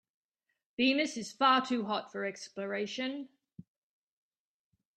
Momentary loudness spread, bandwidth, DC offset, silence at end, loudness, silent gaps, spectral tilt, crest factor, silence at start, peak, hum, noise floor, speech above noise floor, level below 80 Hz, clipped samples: 15 LU; 9.2 kHz; under 0.1%; 1.75 s; -32 LUFS; none; -3.5 dB/octave; 22 dB; 0.8 s; -14 dBFS; none; -85 dBFS; 53 dB; -80 dBFS; under 0.1%